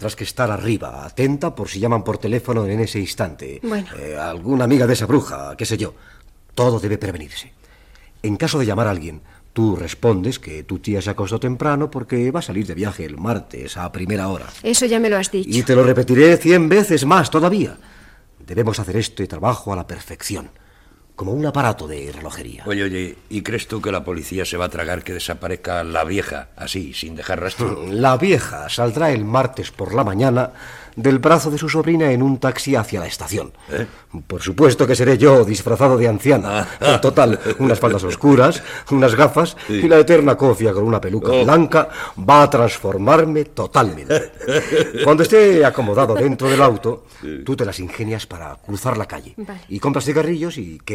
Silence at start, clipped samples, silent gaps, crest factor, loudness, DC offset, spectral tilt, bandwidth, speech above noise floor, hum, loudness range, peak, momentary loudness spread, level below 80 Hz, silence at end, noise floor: 0 s; under 0.1%; none; 16 dB; -17 LUFS; under 0.1%; -5.5 dB/octave; 16 kHz; 32 dB; none; 10 LU; 0 dBFS; 16 LU; -44 dBFS; 0 s; -49 dBFS